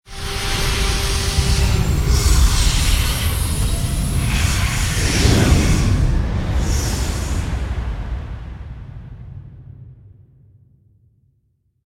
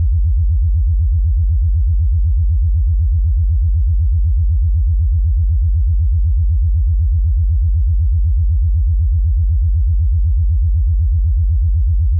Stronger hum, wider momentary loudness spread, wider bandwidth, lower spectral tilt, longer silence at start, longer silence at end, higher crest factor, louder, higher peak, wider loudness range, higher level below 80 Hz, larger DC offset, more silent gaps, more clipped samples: neither; first, 19 LU vs 0 LU; first, 16.5 kHz vs 0.2 kHz; second, -4 dB/octave vs -28 dB/octave; about the same, 0.1 s vs 0 s; first, 1.8 s vs 0 s; first, 18 dB vs 4 dB; second, -19 LUFS vs -16 LUFS; first, 0 dBFS vs -10 dBFS; first, 14 LU vs 0 LU; second, -20 dBFS vs -14 dBFS; neither; neither; neither